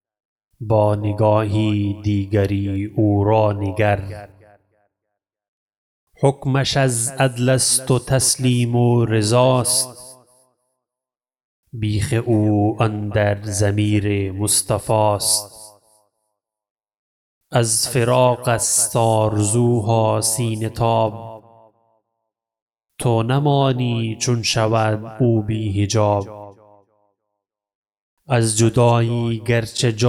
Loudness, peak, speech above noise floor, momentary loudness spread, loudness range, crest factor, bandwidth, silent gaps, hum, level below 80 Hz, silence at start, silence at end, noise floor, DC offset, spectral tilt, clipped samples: -18 LUFS; -2 dBFS; 72 dB; 7 LU; 6 LU; 16 dB; 16 kHz; 5.48-5.68 s, 5.77-6.07 s, 11.44-11.63 s, 16.71-16.75 s, 16.98-17.41 s, 22.62-22.67 s, 27.75-27.83 s, 28.01-28.17 s; none; -48 dBFS; 0.6 s; 0 s; -90 dBFS; under 0.1%; -5 dB/octave; under 0.1%